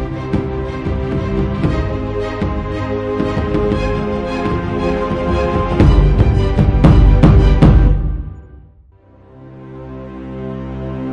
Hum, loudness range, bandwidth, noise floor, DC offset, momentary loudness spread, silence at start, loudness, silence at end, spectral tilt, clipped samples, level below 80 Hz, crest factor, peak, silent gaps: none; 7 LU; 6.8 kHz; -45 dBFS; under 0.1%; 17 LU; 0 s; -15 LUFS; 0 s; -9 dB/octave; under 0.1%; -18 dBFS; 14 dB; 0 dBFS; none